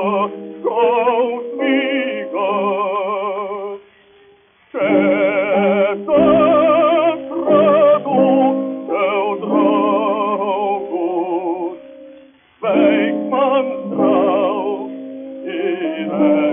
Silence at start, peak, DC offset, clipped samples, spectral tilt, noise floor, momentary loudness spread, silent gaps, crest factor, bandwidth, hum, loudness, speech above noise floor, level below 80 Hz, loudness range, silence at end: 0 s; -2 dBFS; under 0.1%; under 0.1%; -4.5 dB/octave; -51 dBFS; 12 LU; none; 14 dB; 3.7 kHz; none; -16 LUFS; 34 dB; -58 dBFS; 6 LU; 0 s